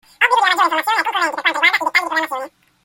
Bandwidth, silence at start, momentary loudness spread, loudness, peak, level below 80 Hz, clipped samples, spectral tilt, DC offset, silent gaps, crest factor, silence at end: 17 kHz; 0.2 s; 10 LU; -16 LUFS; 0 dBFS; -70 dBFS; under 0.1%; 0 dB/octave; under 0.1%; none; 18 dB; 0.35 s